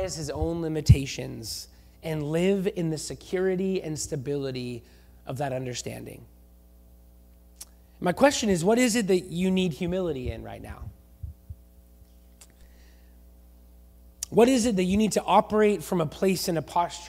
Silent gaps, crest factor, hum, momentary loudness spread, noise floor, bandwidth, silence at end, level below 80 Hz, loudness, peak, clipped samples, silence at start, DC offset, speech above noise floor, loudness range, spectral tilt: none; 22 dB; none; 21 LU; -53 dBFS; 16 kHz; 0 s; -42 dBFS; -26 LUFS; -4 dBFS; under 0.1%; 0 s; under 0.1%; 28 dB; 13 LU; -5.5 dB/octave